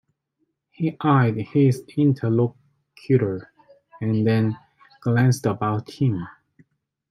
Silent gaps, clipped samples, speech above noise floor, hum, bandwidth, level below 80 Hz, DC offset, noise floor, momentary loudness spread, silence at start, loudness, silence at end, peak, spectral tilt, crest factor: none; under 0.1%; 53 dB; none; 13 kHz; -64 dBFS; under 0.1%; -74 dBFS; 11 LU; 0.8 s; -22 LUFS; 0.8 s; -4 dBFS; -8 dB/octave; 18 dB